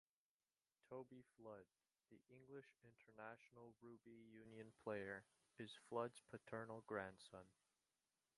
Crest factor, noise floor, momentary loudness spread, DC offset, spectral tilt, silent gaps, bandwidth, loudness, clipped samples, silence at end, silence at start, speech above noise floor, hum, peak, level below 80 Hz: 26 dB; under -90 dBFS; 14 LU; under 0.1%; -5.5 dB/octave; none; 11 kHz; -56 LUFS; under 0.1%; 0.85 s; 0.85 s; over 33 dB; none; -32 dBFS; -88 dBFS